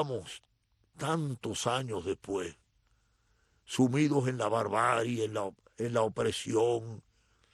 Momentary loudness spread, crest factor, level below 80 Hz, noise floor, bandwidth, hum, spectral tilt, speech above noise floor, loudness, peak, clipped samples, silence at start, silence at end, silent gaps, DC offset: 12 LU; 20 dB; -66 dBFS; -71 dBFS; 12.5 kHz; none; -5.5 dB/octave; 40 dB; -32 LUFS; -14 dBFS; under 0.1%; 0 s; 0.55 s; none; under 0.1%